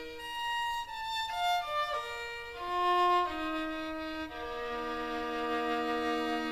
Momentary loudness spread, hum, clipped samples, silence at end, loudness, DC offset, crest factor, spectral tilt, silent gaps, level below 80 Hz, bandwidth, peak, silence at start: 10 LU; none; under 0.1%; 0 s; -33 LUFS; under 0.1%; 14 dB; -3 dB/octave; none; -56 dBFS; 15.5 kHz; -20 dBFS; 0 s